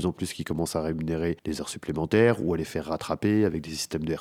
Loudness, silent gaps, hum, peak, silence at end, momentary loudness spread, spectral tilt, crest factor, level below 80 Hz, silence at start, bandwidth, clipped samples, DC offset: -27 LUFS; none; none; -8 dBFS; 0 s; 10 LU; -5.5 dB/octave; 20 dB; -52 dBFS; 0 s; 16 kHz; under 0.1%; under 0.1%